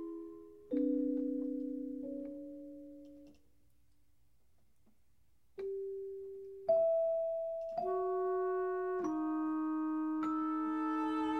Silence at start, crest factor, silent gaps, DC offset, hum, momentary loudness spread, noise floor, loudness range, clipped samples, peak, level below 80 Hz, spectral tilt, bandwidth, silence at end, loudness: 0 s; 16 dB; none; under 0.1%; none; 16 LU; -75 dBFS; 16 LU; under 0.1%; -22 dBFS; -74 dBFS; -7 dB/octave; 6.2 kHz; 0 s; -37 LUFS